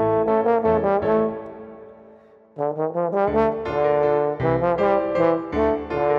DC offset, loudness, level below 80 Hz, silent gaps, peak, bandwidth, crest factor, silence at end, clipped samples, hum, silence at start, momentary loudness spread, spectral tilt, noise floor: under 0.1%; -21 LUFS; -46 dBFS; none; -6 dBFS; 5.8 kHz; 16 dB; 0 s; under 0.1%; none; 0 s; 8 LU; -9 dB/octave; -49 dBFS